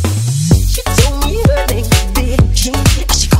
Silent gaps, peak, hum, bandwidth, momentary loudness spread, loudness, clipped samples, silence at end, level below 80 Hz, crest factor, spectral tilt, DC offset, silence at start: none; 0 dBFS; none; 16.5 kHz; 3 LU; -13 LUFS; under 0.1%; 0 s; -16 dBFS; 12 dB; -4.5 dB/octave; under 0.1%; 0 s